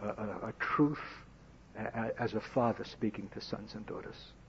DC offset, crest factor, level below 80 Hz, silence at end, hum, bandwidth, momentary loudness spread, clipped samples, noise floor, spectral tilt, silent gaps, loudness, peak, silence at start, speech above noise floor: under 0.1%; 20 dB; -60 dBFS; 0 s; none; 7.6 kHz; 14 LU; under 0.1%; -57 dBFS; -5.5 dB/octave; none; -36 LUFS; -18 dBFS; 0 s; 21 dB